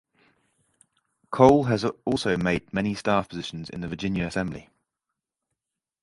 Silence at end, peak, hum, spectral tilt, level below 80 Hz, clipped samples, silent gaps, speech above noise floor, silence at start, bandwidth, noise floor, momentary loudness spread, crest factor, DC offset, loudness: 1.4 s; -2 dBFS; none; -6.5 dB/octave; -52 dBFS; under 0.1%; none; 61 dB; 1.3 s; 11.5 kHz; -85 dBFS; 16 LU; 24 dB; under 0.1%; -25 LUFS